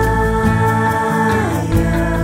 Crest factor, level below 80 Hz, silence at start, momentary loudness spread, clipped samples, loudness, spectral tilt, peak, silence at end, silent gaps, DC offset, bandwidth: 12 dB; -24 dBFS; 0 s; 2 LU; under 0.1%; -16 LUFS; -7 dB/octave; -2 dBFS; 0 s; none; under 0.1%; 16 kHz